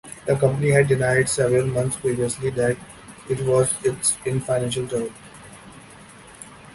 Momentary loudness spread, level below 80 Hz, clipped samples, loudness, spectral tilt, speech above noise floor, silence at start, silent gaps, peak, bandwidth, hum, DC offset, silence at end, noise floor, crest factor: 23 LU; -50 dBFS; under 0.1%; -21 LUFS; -5 dB/octave; 24 dB; 0.05 s; none; -4 dBFS; 12 kHz; none; under 0.1%; 0 s; -45 dBFS; 20 dB